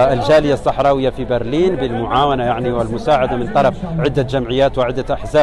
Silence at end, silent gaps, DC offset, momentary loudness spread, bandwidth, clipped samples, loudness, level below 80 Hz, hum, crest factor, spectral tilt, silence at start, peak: 0 s; none; under 0.1%; 6 LU; 11.5 kHz; under 0.1%; -16 LUFS; -32 dBFS; none; 12 dB; -7 dB/octave; 0 s; -4 dBFS